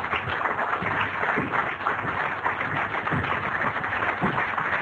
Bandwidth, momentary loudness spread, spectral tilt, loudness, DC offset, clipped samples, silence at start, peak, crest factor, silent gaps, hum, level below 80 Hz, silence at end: 10.5 kHz; 2 LU; -6.5 dB/octave; -25 LUFS; under 0.1%; under 0.1%; 0 s; -8 dBFS; 18 dB; none; none; -52 dBFS; 0 s